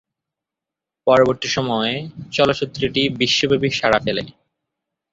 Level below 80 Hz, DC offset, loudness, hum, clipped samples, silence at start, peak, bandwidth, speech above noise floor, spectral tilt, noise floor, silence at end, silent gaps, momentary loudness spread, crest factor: -50 dBFS; under 0.1%; -18 LUFS; none; under 0.1%; 1.05 s; -2 dBFS; 7.8 kHz; 67 dB; -4.5 dB/octave; -86 dBFS; 0.8 s; none; 10 LU; 18 dB